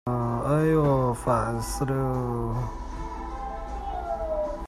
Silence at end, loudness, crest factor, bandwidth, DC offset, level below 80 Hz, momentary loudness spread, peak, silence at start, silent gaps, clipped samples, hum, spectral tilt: 0 s; -27 LUFS; 16 dB; 15 kHz; under 0.1%; -38 dBFS; 13 LU; -12 dBFS; 0.05 s; none; under 0.1%; none; -7.5 dB/octave